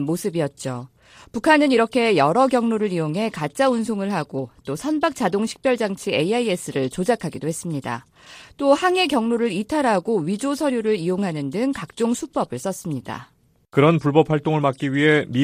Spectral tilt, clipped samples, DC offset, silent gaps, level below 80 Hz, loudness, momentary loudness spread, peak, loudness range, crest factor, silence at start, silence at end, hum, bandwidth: -5.5 dB/octave; under 0.1%; under 0.1%; none; -58 dBFS; -21 LUFS; 11 LU; -2 dBFS; 4 LU; 20 dB; 0 s; 0 s; none; 15.5 kHz